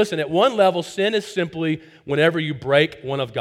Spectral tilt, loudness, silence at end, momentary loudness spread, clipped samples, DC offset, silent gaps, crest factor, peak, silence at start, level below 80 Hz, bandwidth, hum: -5.5 dB/octave; -20 LUFS; 0 s; 8 LU; under 0.1%; under 0.1%; none; 18 dB; -2 dBFS; 0 s; -60 dBFS; 15 kHz; none